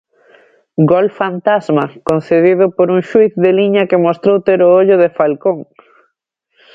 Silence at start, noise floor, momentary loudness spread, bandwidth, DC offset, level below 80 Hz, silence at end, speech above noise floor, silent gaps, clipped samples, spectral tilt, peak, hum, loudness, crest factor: 0.8 s; -68 dBFS; 7 LU; 7.6 kHz; under 0.1%; -56 dBFS; 1.1 s; 57 dB; none; under 0.1%; -8.5 dB/octave; 0 dBFS; none; -12 LUFS; 12 dB